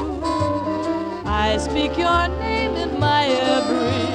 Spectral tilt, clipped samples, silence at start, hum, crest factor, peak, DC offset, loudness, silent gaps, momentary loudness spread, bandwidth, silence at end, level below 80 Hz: -5.5 dB/octave; under 0.1%; 0 s; none; 14 dB; -6 dBFS; under 0.1%; -20 LUFS; none; 6 LU; 10.5 kHz; 0 s; -34 dBFS